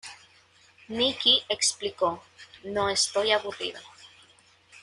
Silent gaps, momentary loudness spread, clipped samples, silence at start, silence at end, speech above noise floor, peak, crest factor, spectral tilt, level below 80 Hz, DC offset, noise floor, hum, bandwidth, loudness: none; 20 LU; under 0.1%; 0.05 s; 0.05 s; 32 dB; -6 dBFS; 22 dB; -1 dB/octave; -66 dBFS; under 0.1%; -59 dBFS; none; 11.5 kHz; -25 LUFS